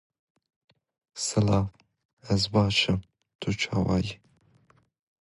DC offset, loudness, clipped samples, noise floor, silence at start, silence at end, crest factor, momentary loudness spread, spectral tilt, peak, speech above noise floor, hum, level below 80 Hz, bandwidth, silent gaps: under 0.1%; -27 LUFS; under 0.1%; -63 dBFS; 1.15 s; 1.05 s; 20 dB; 13 LU; -5 dB/octave; -10 dBFS; 38 dB; none; -48 dBFS; 11.5 kHz; 2.05-2.17 s, 3.35-3.39 s